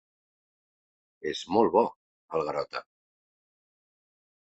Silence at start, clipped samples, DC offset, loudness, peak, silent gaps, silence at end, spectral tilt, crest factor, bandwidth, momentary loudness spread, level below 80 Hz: 1.25 s; under 0.1%; under 0.1%; -29 LUFS; -8 dBFS; 1.96-2.28 s; 1.8 s; -5.5 dB/octave; 24 dB; 8.4 kHz; 14 LU; -68 dBFS